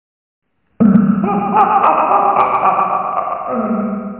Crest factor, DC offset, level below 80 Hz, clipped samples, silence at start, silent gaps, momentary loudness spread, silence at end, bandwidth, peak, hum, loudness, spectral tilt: 14 dB; under 0.1%; -50 dBFS; under 0.1%; 0.8 s; none; 8 LU; 0 s; 4 kHz; 0 dBFS; none; -14 LUFS; -11.5 dB/octave